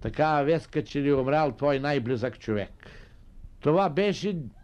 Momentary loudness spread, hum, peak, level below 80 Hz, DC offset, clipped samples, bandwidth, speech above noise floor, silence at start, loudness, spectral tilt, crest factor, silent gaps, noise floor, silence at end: 8 LU; none; -12 dBFS; -50 dBFS; under 0.1%; under 0.1%; 9.6 kHz; 21 dB; 0 s; -26 LUFS; -7 dB/octave; 16 dB; none; -47 dBFS; 0.05 s